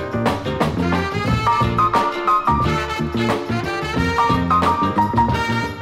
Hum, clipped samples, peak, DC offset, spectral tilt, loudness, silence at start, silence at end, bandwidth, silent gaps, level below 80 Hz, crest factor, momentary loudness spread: none; under 0.1%; -4 dBFS; under 0.1%; -6 dB/octave; -19 LUFS; 0 s; 0 s; 16 kHz; none; -34 dBFS; 14 dB; 5 LU